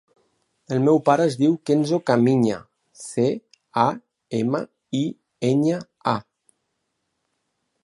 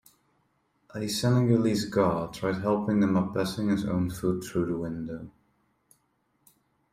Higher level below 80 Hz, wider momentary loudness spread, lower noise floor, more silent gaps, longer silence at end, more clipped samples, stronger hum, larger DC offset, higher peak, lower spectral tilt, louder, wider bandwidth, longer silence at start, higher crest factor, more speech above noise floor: second, -66 dBFS vs -58 dBFS; about the same, 11 LU vs 12 LU; first, -76 dBFS vs -72 dBFS; neither; about the same, 1.6 s vs 1.6 s; neither; neither; neither; first, -4 dBFS vs -10 dBFS; about the same, -7 dB/octave vs -6.5 dB/octave; first, -22 LUFS vs -27 LUFS; second, 11.5 kHz vs 15.5 kHz; second, 0.7 s vs 0.95 s; about the same, 20 dB vs 18 dB; first, 56 dB vs 46 dB